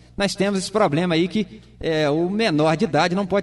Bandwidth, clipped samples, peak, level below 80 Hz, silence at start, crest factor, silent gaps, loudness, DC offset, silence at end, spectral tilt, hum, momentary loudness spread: 11.5 kHz; under 0.1%; -6 dBFS; -48 dBFS; 0.2 s; 16 dB; none; -21 LUFS; under 0.1%; 0 s; -5.5 dB/octave; none; 6 LU